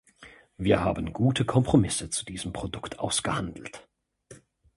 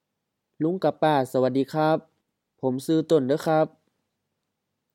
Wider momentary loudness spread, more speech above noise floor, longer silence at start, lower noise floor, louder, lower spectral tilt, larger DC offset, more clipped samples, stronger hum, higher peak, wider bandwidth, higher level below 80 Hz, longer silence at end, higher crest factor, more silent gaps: first, 13 LU vs 7 LU; second, 27 dB vs 58 dB; second, 0.2 s vs 0.6 s; second, -53 dBFS vs -81 dBFS; second, -27 LUFS vs -24 LUFS; second, -5 dB/octave vs -7 dB/octave; neither; neither; neither; about the same, -6 dBFS vs -8 dBFS; second, 11.5 kHz vs 16.5 kHz; first, -46 dBFS vs -76 dBFS; second, 0.4 s vs 1.25 s; about the same, 22 dB vs 18 dB; neither